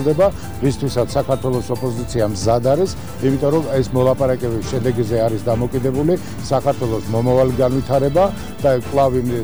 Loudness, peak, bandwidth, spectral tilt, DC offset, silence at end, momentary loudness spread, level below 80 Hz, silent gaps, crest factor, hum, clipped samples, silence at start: -18 LUFS; -4 dBFS; over 20 kHz; -7 dB/octave; 2%; 0 s; 5 LU; -36 dBFS; none; 12 dB; none; under 0.1%; 0 s